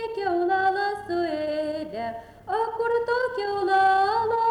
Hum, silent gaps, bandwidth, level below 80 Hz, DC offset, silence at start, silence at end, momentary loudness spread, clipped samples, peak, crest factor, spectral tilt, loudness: none; none; 11.5 kHz; -58 dBFS; under 0.1%; 0 s; 0 s; 11 LU; under 0.1%; -10 dBFS; 14 dB; -5 dB/octave; -25 LUFS